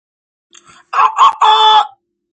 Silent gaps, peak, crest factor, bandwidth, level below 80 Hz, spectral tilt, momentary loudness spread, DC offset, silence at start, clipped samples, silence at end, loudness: none; 0 dBFS; 12 dB; 8.8 kHz; -70 dBFS; 1.5 dB/octave; 11 LU; under 0.1%; 0.95 s; under 0.1%; 0.45 s; -10 LUFS